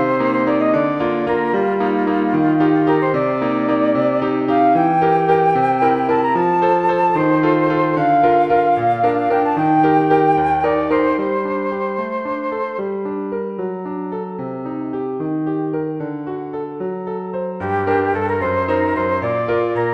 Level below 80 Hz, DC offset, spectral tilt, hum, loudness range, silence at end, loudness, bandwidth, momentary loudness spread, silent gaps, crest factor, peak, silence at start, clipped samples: -52 dBFS; 0.1%; -9 dB/octave; none; 9 LU; 0 s; -18 LUFS; 6 kHz; 11 LU; none; 14 dB; -2 dBFS; 0 s; under 0.1%